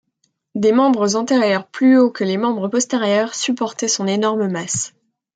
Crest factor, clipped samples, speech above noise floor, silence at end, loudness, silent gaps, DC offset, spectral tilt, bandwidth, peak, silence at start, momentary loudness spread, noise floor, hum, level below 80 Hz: 14 dB; under 0.1%; 51 dB; 0.5 s; -17 LUFS; none; under 0.1%; -4 dB/octave; 9.4 kHz; -2 dBFS; 0.55 s; 7 LU; -68 dBFS; none; -66 dBFS